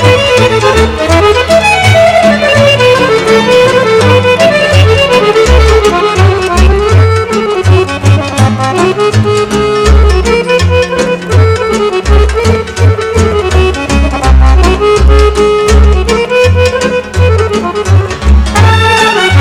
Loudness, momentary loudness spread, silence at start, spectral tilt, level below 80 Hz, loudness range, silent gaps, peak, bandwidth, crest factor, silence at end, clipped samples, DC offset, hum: -7 LUFS; 4 LU; 0 s; -5.5 dB/octave; -14 dBFS; 3 LU; none; 0 dBFS; 13.5 kHz; 6 dB; 0 s; 8%; under 0.1%; none